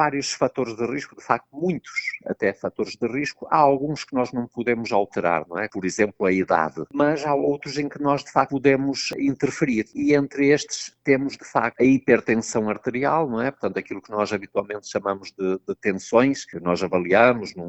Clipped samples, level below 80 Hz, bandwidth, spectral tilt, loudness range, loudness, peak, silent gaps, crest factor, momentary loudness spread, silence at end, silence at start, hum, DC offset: under 0.1%; -60 dBFS; 8.4 kHz; -5 dB/octave; 4 LU; -23 LUFS; -2 dBFS; none; 22 dB; 9 LU; 0 s; 0 s; none; under 0.1%